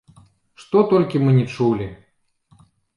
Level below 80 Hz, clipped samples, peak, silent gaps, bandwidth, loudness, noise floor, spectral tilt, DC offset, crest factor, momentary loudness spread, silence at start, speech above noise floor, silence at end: -54 dBFS; under 0.1%; -4 dBFS; none; 10.5 kHz; -18 LUFS; -64 dBFS; -9 dB/octave; under 0.1%; 18 dB; 8 LU; 0.6 s; 47 dB; 1 s